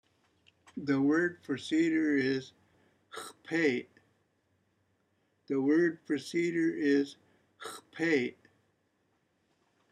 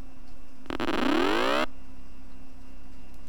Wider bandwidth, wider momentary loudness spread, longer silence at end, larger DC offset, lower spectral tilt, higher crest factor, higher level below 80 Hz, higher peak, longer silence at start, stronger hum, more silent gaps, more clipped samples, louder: second, 12.5 kHz vs over 20 kHz; first, 17 LU vs 9 LU; first, 1.6 s vs 0 s; second, under 0.1% vs 4%; about the same, -5.5 dB/octave vs -4.5 dB/octave; about the same, 18 dB vs 20 dB; second, -82 dBFS vs -48 dBFS; second, -16 dBFS vs -10 dBFS; first, 0.75 s vs 0 s; neither; neither; neither; second, -31 LUFS vs -27 LUFS